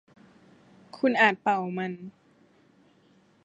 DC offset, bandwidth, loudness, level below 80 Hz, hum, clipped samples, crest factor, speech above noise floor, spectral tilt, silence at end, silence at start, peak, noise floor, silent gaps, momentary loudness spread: under 0.1%; 9.6 kHz; -25 LUFS; -78 dBFS; none; under 0.1%; 24 dB; 36 dB; -6 dB/octave; 1.35 s; 0.95 s; -6 dBFS; -62 dBFS; none; 19 LU